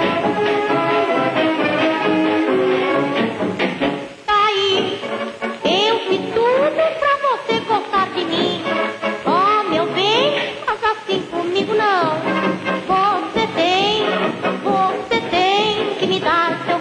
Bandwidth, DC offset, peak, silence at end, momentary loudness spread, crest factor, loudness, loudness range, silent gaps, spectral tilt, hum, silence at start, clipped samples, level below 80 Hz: 10.5 kHz; under 0.1%; -4 dBFS; 0 s; 6 LU; 14 dB; -18 LUFS; 1 LU; none; -4.5 dB/octave; none; 0 s; under 0.1%; -56 dBFS